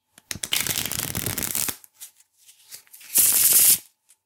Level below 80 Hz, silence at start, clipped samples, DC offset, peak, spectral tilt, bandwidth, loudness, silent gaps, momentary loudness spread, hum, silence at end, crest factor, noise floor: -56 dBFS; 0.3 s; under 0.1%; under 0.1%; -2 dBFS; 0 dB/octave; 19 kHz; -19 LUFS; none; 16 LU; none; 0.45 s; 22 dB; -56 dBFS